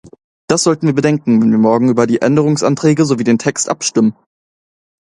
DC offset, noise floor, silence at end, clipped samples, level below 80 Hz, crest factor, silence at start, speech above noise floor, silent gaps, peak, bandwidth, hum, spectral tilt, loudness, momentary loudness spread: under 0.1%; under -90 dBFS; 0.95 s; under 0.1%; -54 dBFS; 14 dB; 0.5 s; over 78 dB; none; 0 dBFS; 11 kHz; none; -5.5 dB/octave; -13 LUFS; 4 LU